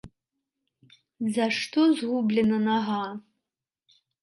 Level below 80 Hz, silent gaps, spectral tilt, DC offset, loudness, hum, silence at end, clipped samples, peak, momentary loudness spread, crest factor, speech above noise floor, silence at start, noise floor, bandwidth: -68 dBFS; none; -5.5 dB/octave; under 0.1%; -25 LUFS; none; 1 s; under 0.1%; -12 dBFS; 10 LU; 16 dB; 63 dB; 0.05 s; -88 dBFS; 11.5 kHz